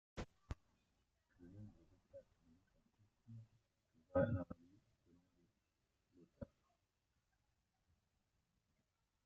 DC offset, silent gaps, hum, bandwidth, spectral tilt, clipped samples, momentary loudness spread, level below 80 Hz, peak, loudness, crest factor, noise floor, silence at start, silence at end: under 0.1%; none; none; 7.4 kHz; -8 dB/octave; under 0.1%; 24 LU; -68 dBFS; -28 dBFS; -45 LUFS; 26 dB; -87 dBFS; 0.15 s; 2.8 s